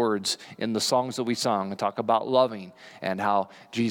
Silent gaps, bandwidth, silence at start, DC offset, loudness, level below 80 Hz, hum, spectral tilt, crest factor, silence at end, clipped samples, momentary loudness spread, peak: none; 18.5 kHz; 0 s; under 0.1%; -26 LUFS; -80 dBFS; none; -4 dB/octave; 18 dB; 0 s; under 0.1%; 9 LU; -8 dBFS